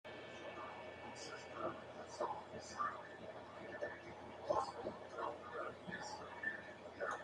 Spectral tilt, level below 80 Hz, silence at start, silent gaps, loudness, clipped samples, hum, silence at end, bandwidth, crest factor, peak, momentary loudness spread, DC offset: -4 dB/octave; -80 dBFS; 0.05 s; none; -47 LUFS; under 0.1%; none; 0 s; 11.5 kHz; 22 dB; -24 dBFS; 10 LU; under 0.1%